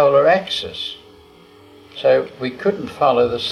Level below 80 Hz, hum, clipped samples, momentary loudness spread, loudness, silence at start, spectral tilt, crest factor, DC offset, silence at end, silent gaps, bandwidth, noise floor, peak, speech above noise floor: -54 dBFS; none; under 0.1%; 13 LU; -18 LUFS; 0 s; -5 dB/octave; 16 dB; under 0.1%; 0 s; none; 12 kHz; -46 dBFS; -2 dBFS; 27 dB